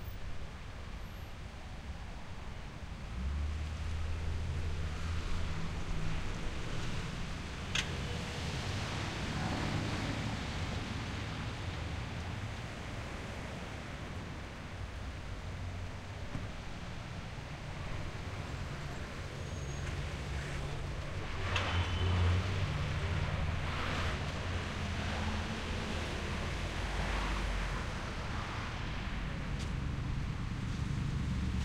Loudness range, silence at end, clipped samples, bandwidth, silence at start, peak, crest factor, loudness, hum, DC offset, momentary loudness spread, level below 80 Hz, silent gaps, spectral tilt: 8 LU; 0 s; under 0.1%; 16 kHz; 0 s; -18 dBFS; 20 dB; -39 LUFS; none; under 0.1%; 9 LU; -44 dBFS; none; -5 dB/octave